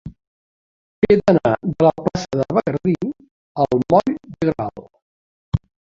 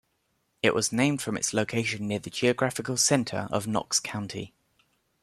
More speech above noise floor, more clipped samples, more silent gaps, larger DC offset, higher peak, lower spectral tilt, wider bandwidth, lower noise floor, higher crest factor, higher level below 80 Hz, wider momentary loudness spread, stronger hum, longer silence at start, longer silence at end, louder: first, over 73 dB vs 46 dB; neither; first, 0.27-1.02 s, 3.31-3.55 s, 5.02-5.52 s vs none; neither; first, 0 dBFS vs -8 dBFS; first, -8 dB/octave vs -3.5 dB/octave; second, 7.6 kHz vs 15 kHz; first, under -90 dBFS vs -74 dBFS; about the same, 20 dB vs 20 dB; first, -44 dBFS vs -64 dBFS; about the same, 12 LU vs 10 LU; neither; second, 0.05 s vs 0.65 s; second, 0.4 s vs 0.75 s; first, -19 LUFS vs -27 LUFS